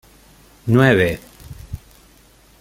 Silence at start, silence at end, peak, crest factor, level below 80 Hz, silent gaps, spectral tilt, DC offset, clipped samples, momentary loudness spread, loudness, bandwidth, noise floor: 0.65 s; 0.85 s; -2 dBFS; 18 dB; -44 dBFS; none; -7 dB/octave; under 0.1%; under 0.1%; 25 LU; -16 LUFS; 16 kHz; -50 dBFS